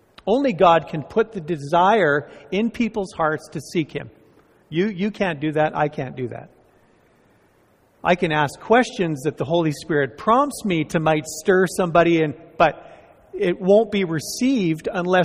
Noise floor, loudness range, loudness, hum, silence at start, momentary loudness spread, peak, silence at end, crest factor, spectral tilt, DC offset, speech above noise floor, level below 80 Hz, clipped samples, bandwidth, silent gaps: -58 dBFS; 6 LU; -21 LUFS; none; 0.25 s; 11 LU; -2 dBFS; 0 s; 18 dB; -5.5 dB/octave; under 0.1%; 38 dB; -54 dBFS; under 0.1%; 15.5 kHz; none